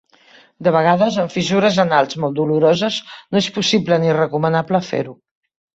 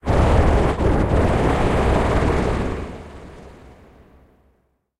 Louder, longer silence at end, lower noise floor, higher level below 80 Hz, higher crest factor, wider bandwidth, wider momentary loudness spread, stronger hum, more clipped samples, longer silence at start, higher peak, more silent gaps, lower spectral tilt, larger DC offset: about the same, -17 LUFS vs -19 LUFS; second, 0.6 s vs 1.5 s; second, -49 dBFS vs -64 dBFS; second, -58 dBFS vs -24 dBFS; about the same, 16 dB vs 16 dB; second, 8 kHz vs 12 kHz; second, 7 LU vs 20 LU; neither; neither; first, 0.6 s vs 0.05 s; about the same, -2 dBFS vs -2 dBFS; neither; second, -5.5 dB/octave vs -7.5 dB/octave; neither